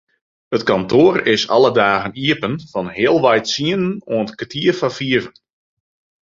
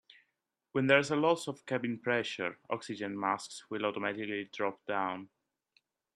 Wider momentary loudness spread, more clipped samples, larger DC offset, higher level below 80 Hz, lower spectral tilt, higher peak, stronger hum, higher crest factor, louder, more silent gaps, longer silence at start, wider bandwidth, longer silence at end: about the same, 10 LU vs 11 LU; neither; neither; first, -54 dBFS vs -78 dBFS; about the same, -5 dB/octave vs -5 dB/octave; first, 0 dBFS vs -10 dBFS; neither; second, 16 dB vs 24 dB; first, -16 LUFS vs -33 LUFS; neither; second, 0.5 s vs 0.75 s; second, 7.6 kHz vs 13 kHz; about the same, 0.9 s vs 0.9 s